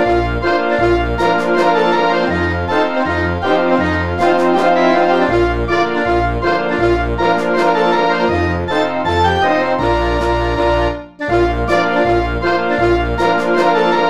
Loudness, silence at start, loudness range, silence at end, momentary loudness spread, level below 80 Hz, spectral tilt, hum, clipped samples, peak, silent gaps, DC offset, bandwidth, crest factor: -15 LUFS; 0 s; 1 LU; 0 s; 3 LU; -28 dBFS; -6.5 dB/octave; none; under 0.1%; -2 dBFS; none; 2%; 11 kHz; 14 dB